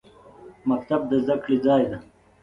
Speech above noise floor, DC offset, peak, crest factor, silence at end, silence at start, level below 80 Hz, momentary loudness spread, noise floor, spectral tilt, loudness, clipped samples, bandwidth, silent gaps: 25 dB; under 0.1%; -8 dBFS; 16 dB; 0.4 s; 0.4 s; -58 dBFS; 9 LU; -47 dBFS; -8.5 dB/octave; -23 LUFS; under 0.1%; 5.4 kHz; none